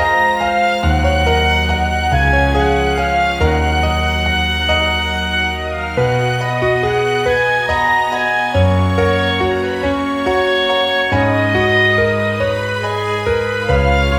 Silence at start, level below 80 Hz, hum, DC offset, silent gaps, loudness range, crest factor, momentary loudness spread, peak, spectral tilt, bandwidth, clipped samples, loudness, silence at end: 0 s; -24 dBFS; none; under 0.1%; none; 1 LU; 14 dB; 4 LU; -2 dBFS; -5.5 dB/octave; 19 kHz; under 0.1%; -15 LUFS; 0 s